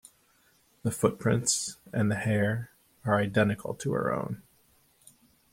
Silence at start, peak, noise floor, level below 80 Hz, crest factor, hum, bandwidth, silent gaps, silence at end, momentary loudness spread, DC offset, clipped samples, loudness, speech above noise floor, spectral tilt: 0.85 s; -8 dBFS; -66 dBFS; -62 dBFS; 22 dB; none; 16.5 kHz; none; 1.15 s; 11 LU; under 0.1%; under 0.1%; -29 LUFS; 38 dB; -5 dB/octave